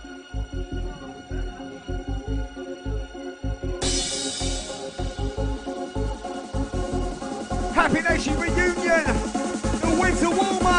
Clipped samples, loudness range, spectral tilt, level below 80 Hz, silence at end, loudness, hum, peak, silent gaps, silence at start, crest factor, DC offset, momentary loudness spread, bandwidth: under 0.1%; 10 LU; -4.5 dB/octave; -32 dBFS; 0 s; -26 LUFS; none; -4 dBFS; none; 0 s; 22 dB; under 0.1%; 13 LU; 10.5 kHz